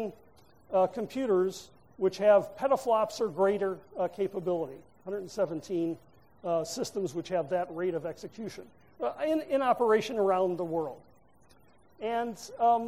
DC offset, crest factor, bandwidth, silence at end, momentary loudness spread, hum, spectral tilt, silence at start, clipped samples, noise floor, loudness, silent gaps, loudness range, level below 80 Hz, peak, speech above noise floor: under 0.1%; 20 dB; 15.5 kHz; 0 s; 14 LU; none; -5.5 dB/octave; 0 s; under 0.1%; -62 dBFS; -30 LUFS; none; 6 LU; -68 dBFS; -12 dBFS; 33 dB